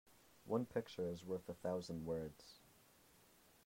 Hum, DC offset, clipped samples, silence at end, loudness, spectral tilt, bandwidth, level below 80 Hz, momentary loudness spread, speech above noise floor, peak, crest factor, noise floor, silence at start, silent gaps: none; under 0.1%; under 0.1%; 1 s; -45 LUFS; -6.5 dB/octave; 16 kHz; -74 dBFS; 20 LU; 25 dB; -26 dBFS; 22 dB; -70 dBFS; 0.45 s; none